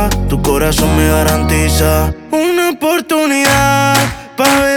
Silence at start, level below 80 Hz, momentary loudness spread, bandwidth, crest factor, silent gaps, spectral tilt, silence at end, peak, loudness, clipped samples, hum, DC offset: 0 s; -20 dBFS; 5 LU; 19.5 kHz; 12 dB; none; -4.5 dB/octave; 0 s; 0 dBFS; -12 LUFS; under 0.1%; none; under 0.1%